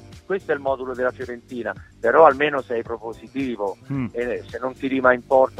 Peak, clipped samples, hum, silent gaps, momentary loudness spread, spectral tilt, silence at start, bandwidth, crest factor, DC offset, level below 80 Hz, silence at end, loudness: 0 dBFS; under 0.1%; none; none; 16 LU; -6.5 dB/octave; 0.05 s; 11.5 kHz; 22 dB; under 0.1%; -54 dBFS; 0 s; -22 LUFS